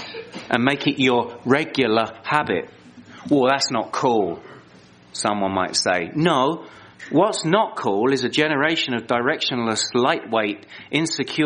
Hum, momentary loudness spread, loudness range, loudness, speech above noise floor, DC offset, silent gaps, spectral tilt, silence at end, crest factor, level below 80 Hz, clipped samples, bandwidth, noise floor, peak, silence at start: none; 8 LU; 2 LU; -21 LUFS; 28 dB; under 0.1%; none; -4 dB/octave; 0 s; 20 dB; -64 dBFS; under 0.1%; 10 kHz; -49 dBFS; 0 dBFS; 0 s